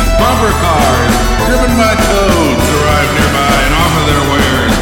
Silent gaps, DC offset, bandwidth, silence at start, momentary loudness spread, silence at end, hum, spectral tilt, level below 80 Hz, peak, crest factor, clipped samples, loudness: none; under 0.1%; 19.5 kHz; 0 s; 1 LU; 0 s; none; -4.5 dB/octave; -16 dBFS; 0 dBFS; 10 dB; under 0.1%; -10 LUFS